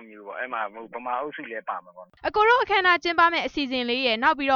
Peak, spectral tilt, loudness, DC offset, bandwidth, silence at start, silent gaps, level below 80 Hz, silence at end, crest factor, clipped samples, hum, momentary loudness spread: -8 dBFS; -3.5 dB/octave; -23 LUFS; under 0.1%; 7 kHz; 0 s; none; -58 dBFS; 0 s; 16 dB; under 0.1%; none; 15 LU